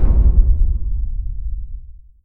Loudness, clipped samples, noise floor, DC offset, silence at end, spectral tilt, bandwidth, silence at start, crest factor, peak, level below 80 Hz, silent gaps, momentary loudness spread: -20 LUFS; under 0.1%; -34 dBFS; under 0.1%; 0.35 s; -13 dB/octave; 1.6 kHz; 0 s; 16 dB; 0 dBFS; -16 dBFS; none; 18 LU